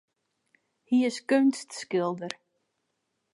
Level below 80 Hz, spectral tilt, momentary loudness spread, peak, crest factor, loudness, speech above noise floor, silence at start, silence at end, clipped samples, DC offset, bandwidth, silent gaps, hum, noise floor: -84 dBFS; -5 dB/octave; 14 LU; -10 dBFS; 20 dB; -27 LUFS; 53 dB; 0.9 s; 1 s; under 0.1%; under 0.1%; 11.5 kHz; none; none; -79 dBFS